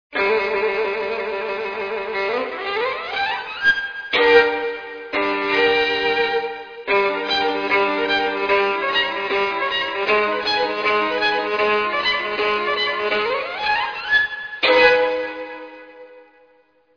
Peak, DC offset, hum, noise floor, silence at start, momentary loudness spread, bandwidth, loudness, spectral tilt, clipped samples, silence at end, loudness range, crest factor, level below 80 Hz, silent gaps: 0 dBFS; under 0.1%; none; -57 dBFS; 0.1 s; 9 LU; 5.4 kHz; -19 LUFS; -3.5 dB/octave; under 0.1%; 0.75 s; 2 LU; 20 dB; -56 dBFS; none